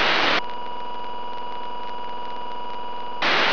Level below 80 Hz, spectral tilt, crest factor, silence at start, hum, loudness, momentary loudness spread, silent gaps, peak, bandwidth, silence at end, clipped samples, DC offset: -60 dBFS; -3 dB/octave; 18 dB; 0 s; none; -26 LUFS; 13 LU; none; -8 dBFS; 5.4 kHz; 0 s; under 0.1%; 5%